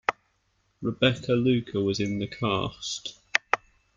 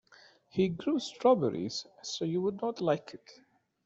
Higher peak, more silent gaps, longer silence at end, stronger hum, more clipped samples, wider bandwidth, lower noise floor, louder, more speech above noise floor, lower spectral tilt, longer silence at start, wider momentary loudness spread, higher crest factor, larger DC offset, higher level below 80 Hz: first, -2 dBFS vs -12 dBFS; neither; second, 0.4 s vs 0.55 s; neither; neither; about the same, 7.8 kHz vs 8.2 kHz; first, -71 dBFS vs -60 dBFS; first, -27 LUFS vs -32 LUFS; first, 44 dB vs 29 dB; about the same, -5 dB/octave vs -5.5 dB/octave; second, 0.1 s vs 0.55 s; second, 9 LU vs 12 LU; first, 26 dB vs 20 dB; neither; first, -58 dBFS vs -70 dBFS